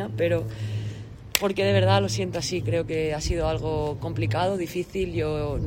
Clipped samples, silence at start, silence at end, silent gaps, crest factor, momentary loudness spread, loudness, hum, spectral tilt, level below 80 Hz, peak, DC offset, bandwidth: under 0.1%; 0 s; 0 s; none; 24 dB; 10 LU; -26 LUFS; none; -5.5 dB/octave; -40 dBFS; 0 dBFS; under 0.1%; 16 kHz